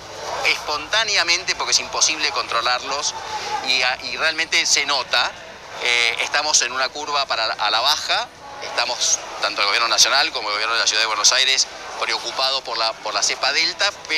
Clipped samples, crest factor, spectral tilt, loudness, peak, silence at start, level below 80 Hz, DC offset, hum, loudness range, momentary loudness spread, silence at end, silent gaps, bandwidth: under 0.1%; 16 dB; 1.5 dB/octave; -18 LUFS; -4 dBFS; 0 s; -56 dBFS; under 0.1%; none; 3 LU; 8 LU; 0 s; none; 16 kHz